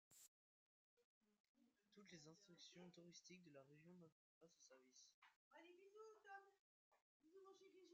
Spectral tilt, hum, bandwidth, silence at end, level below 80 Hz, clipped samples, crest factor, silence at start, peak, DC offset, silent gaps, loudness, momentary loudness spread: -3.5 dB/octave; none; 7.4 kHz; 0 s; under -90 dBFS; under 0.1%; 20 dB; 0.1 s; -50 dBFS; under 0.1%; 0.28-0.97 s, 1.04-1.21 s, 1.40-1.55 s, 4.12-4.41 s, 5.14-5.22 s, 5.36-5.51 s, 6.59-6.91 s, 7.02-7.20 s; -66 LUFS; 5 LU